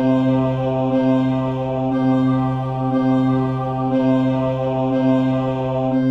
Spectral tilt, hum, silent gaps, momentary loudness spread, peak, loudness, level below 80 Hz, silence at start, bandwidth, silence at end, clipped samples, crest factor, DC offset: -9.5 dB/octave; none; none; 4 LU; -6 dBFS; -19 LUFS; -46 dBFS; 0 s; 5.6 kHz; 0 s; under 0.1%; 12 dB; under 0.1%